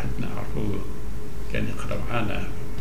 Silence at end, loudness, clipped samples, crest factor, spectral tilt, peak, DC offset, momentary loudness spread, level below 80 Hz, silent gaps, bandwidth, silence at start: 0 s; -31 LUFS; under 0.1%; 18 dB; -6.5 dB/octave; -10 dBFS; 9%; 9 LU; -36 dBFS; none; 16 kHz; 0 s